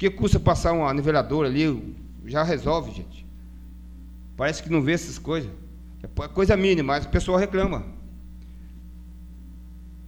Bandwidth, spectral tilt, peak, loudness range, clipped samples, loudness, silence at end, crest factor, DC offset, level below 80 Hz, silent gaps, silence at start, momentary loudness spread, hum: 20 kHz; -6.5 dB/octave; -4 dBFS; 5 LU; under 0.1%; -24 LUFS; 0 s; 22 dB; under 0.1%; -36 dBFS; none; 0 s; 23 LU; none